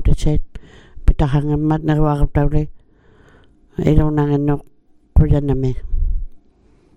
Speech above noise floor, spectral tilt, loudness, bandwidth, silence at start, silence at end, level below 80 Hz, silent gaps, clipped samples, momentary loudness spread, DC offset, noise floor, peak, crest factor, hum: 37 dB; -9 dB/octave; -18 LUFS; 9.2 kHz; 0 s; 0.6 s; -22 dBFS; none; under 0.1%; 10 LU; under 0.1%; -52 dBFS; 0 dBFS; 16 dB; none